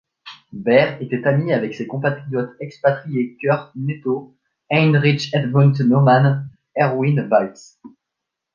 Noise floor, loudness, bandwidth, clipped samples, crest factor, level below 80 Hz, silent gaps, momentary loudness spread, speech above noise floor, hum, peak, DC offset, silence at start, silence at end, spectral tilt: -81 dBFS; -18 LUFS; 7 kHz; under 0.1%; 18 dB; -62 dBFS; none; 11 LU; 64 dB; none; 0 dBFS; under 0.1%; 0.25 s; 0.65 s; -8 dB/octave